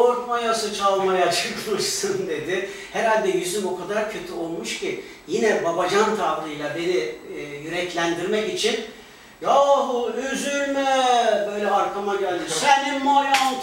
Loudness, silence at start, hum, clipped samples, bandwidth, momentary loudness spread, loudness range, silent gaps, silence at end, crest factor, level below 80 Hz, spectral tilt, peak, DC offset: -22 LUFS; 0 s; none; under 0.1%; 16 kHz; 10 LU; 4 LU; none; 0 s; 20 dB; -60 dBFS; -3 dB/octave; -2 dBFS; under 0.1%